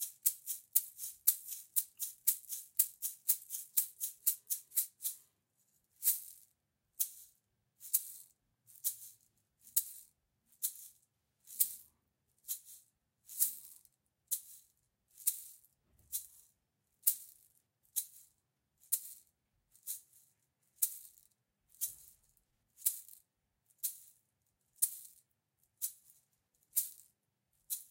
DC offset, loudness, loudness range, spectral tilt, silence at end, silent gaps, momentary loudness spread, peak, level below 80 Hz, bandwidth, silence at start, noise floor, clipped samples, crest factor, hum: under 0.1%; -36 LUFS; 8 LU; 4 dB/octave; 0.05 s; none; 21 LU; -10 dBFS; -88 dBFS; 17 kHz; 0 s; -82 dBFS; under 0.1%; 32 dB; none